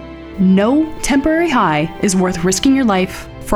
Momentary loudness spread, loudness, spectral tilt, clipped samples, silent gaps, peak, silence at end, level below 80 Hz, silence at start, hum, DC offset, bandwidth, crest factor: 5 LU; -14 LUFS; -5 dB/octave; under 0.1%; none; 0 dBFS; 0 s; -34 dBFS; 0 s; none; under 0.1%; 15 kHz; 14 dB